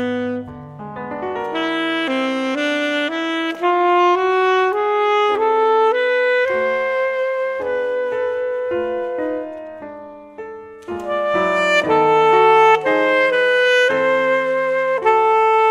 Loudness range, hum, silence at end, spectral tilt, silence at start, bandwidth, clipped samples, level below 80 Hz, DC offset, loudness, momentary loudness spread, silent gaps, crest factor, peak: 9 LU; none; 0 s; -4.5 dB/octave; 0 s; 11 kHz; under 0.1%; -60 dBFS; under 0.1%; -17 LUFS; 17 LU; none; 14 dB; -2 dBFS